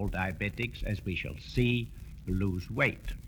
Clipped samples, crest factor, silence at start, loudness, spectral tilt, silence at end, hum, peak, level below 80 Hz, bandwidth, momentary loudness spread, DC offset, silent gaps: under 0.1%; 18 dB; 0 s; -32 LUFS; -7 dB/octave; 0 s; none; -14 dBFS; -42 dBFS; over 20 kHz; 7 LU; under 0.1%; none